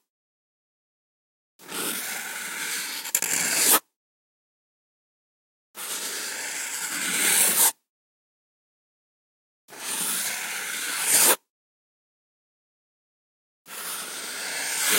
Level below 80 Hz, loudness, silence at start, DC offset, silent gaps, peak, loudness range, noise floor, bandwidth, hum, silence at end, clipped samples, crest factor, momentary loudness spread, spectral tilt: -84 dBFS; -23 LUFS; 1.6 s; under 0.1%; 3.96-5.74 s, 7.89-9.68 s, 11.50-13.65 s; -4 dBFS; 8 LU; under -90 dBFS; 16.5 kHz; none; 0 s; under 0.1%; 24 dB; 14 LU; 1 dB/octave